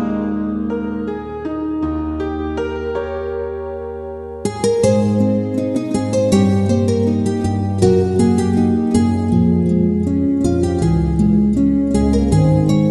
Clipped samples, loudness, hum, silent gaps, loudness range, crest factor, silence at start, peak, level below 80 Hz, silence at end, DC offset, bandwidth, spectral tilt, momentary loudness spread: under 0.1%; -17 LUFS; none; none; 7 LU; 14 dB; 0 s; -2 dBFS; -32 dBFS; 0 s; under 0.1%; 11.5 kHz; -8 dB/octave; 10 LU